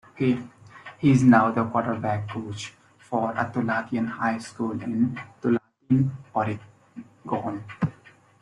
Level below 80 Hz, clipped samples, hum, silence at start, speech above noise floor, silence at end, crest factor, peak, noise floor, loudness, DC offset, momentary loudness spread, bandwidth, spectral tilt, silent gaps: -60 dBFS; under 0.1%; none; 0.15 s; 30 dB; 0.5 s; 20 dB; -4 dBFS; -54 dBFS; -25 LUFS; under 0.1%; 18 LU; 10.5 kHz; -7.5 dB/octave; none